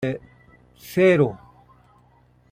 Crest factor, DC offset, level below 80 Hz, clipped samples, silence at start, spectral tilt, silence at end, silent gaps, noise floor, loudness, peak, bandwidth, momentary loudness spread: 18 dB; under 0.1%; -58 dBFS; under 0.1%; 0 s; -7.5 dB/octave; 1.15 s; none; -57 dBFS; -20 LUFS; -6 dBFS; 16 kHz; 19 LU